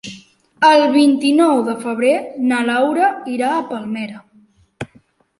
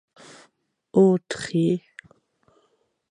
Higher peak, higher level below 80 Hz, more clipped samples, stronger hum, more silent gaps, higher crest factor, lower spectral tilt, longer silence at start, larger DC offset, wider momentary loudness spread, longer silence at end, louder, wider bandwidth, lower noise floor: about the same, -2 dBFS vs -4 dBFS; first, -62 dBFS vs -68 dBFS; neither; neither; neither; about the same, 16 dB vs 20 dB; second, -4.5 dB/octave vs -7 dB/octave; second, 0.05 s vs 0.95 s; neither; first, 21 LU vs 8 LU; second, 0.55 s vs 1.35 s; first, -16 LUFS vs -22 LUFS; about the same, 11.5 kHz vs 11 kHz; second, -53 dBFS vs -68 dBFS